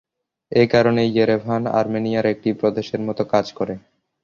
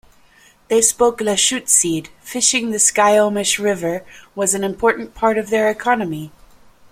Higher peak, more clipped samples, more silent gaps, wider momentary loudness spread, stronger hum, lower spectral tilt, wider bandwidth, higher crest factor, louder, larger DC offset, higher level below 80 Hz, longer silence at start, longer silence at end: about the same, -2 dBFS vs 0 dBFS; neither; neither; about the same, 10 LU vs 12 LU; neither; first, -7 dB/octave vs -2 dB/octave; second, 7.2 kHz vs 16.5 kHz; about the same, 18 dB vs 18 dB; second, -20 LUFS vs -16 LUFS; neither; about the same, -56 dBFS vs -52 dBFS; second, 0.5 s vs 0.7 s; second, 0.45 s vs 0.65 s